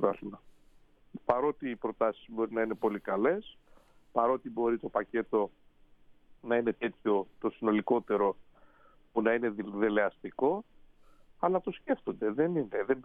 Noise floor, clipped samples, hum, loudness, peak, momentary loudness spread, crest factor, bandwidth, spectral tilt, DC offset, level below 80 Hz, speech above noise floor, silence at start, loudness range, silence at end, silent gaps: -61 dBFS; under 0.1%; none; -32 LUFS; -10 dBFS; 7 LU; 22 dB; 3.9 kHz; -9 dB/octave; under 0.1%; -64 dBFS; 30 dB; 0 s; 2 LU; 0 s; none